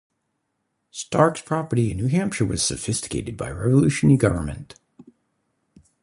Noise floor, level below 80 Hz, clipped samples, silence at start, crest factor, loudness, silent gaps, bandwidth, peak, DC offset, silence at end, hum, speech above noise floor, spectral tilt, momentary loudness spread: -75 dBFS; -44 dBFS; under 0.1%; 0.95 s; 20 dB; -22 LUFS; none; 11.5 kHz; -2 dBFS; under 0.1%; 1 s; none; 54 dB; -5.5 dB/octave; 14 LU